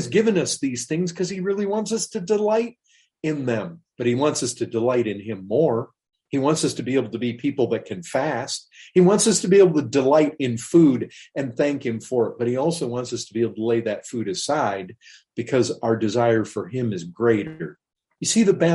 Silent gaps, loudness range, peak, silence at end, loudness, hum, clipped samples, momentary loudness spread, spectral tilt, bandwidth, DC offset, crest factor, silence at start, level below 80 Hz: none; 6 LU; -4 dBFS; 0 s; -22 LUFS; none; under 0.1%; 11 LU; -5 dB/octave; 11.5 kHz; under 0.1%; 18 dB; 0 s; -64 dBFS